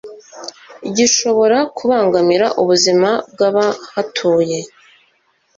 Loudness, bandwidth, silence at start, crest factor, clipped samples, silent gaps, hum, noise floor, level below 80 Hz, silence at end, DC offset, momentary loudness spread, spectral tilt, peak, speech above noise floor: -14 LUFS; 7.8 kHz; 0.05 s; 14 dB; under 0.1%; none; none; -60 dBFS; -60 dBFS; 0.9 s; under 0.1%; 19 LU; -3 dB/octave; -2 dBFS; 45 dB